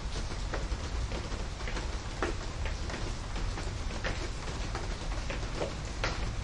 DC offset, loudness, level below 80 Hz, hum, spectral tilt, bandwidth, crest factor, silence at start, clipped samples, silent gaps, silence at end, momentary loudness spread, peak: under 0.1%; -37 LUFS; -36 dBFS; none; -4.5 dB/octave; 11 kHz; 20 dB; 0 s; under 0.1%; none; 0 s; 3 LU; -14 dBFS